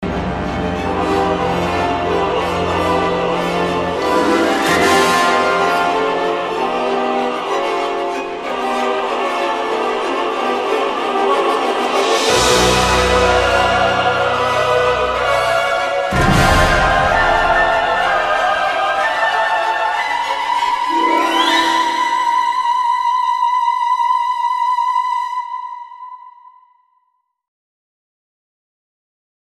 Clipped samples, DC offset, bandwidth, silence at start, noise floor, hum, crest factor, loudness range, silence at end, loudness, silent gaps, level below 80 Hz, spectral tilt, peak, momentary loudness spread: under 0.1%; under 0.1%; 14 kHz; 0 s; -66 dBFS; none; 16 dB; 5 LU; 3.2 s; -15 LUFS; none; -34 dBFS; -4 dB/octave; 0 dBFS; 6 LU